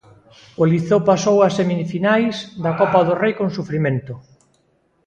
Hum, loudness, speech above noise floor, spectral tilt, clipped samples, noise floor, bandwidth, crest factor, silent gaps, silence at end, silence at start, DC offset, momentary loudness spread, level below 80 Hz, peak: none; -18 LUFS; 45 dB; -6.5 dB/octave; under 0.1%; -62 dBFS; 8.8 kHz; 18 dB; none; 0.85 s; 0.6 s; under 0.1%; 8 LU; -56 dBFS; 0 dBFS